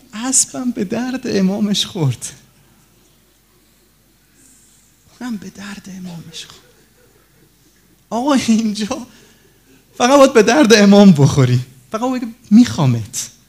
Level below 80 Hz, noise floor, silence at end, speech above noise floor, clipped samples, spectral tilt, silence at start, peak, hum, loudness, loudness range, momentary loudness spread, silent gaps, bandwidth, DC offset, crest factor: -52 dBFS; -54 dBFS; 0.2 s; 40 dB; 0.2%; -5 dB/octave; 0.15 s; 0 dBFS; none; -13 LUFS; 22 LU; 22 LU; none; 16 kHz; under 0.1%; 16 dB